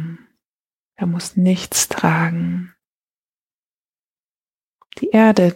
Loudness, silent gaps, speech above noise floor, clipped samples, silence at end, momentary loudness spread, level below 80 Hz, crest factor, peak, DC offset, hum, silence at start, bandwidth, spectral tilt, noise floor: -18 LUFS; 0.45-0.91 s, 2.87-3.48 s, 3.54-3.93 s, 4.03-4.46 s, 4.54-4.79 s; over 74 dB; under 0.1%; 0 s; 14 LU; -58 dBFS; 18 dB; -2 dBFS; under 0.1%; none; 0 s; 16.5 kHz; -5 dB/octave; under -90 dBFS